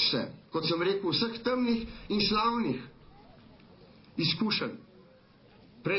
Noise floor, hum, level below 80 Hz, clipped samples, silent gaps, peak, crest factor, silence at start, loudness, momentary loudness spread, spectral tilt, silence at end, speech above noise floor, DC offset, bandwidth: -58 dBFS; none; -58 dBFS; under 0.1%; none; -14 dBFS; 18 dB; 0 s; -30 LUFS; 11 LU; -8 dB/octave; 0 s; 28 dB; under 0.1%; 5.8 kHz